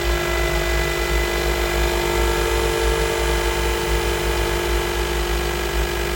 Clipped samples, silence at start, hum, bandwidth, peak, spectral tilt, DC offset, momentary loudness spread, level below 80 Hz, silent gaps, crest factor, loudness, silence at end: under 0.1%; 0 s; 50 Hz at -35 dBFS; 19.5 kHz; -6 dBFS; -4 dB/octave; under 0.1%; 2 LU; -24 dBFS; none; 14 dB; -21 LUFS; 0 s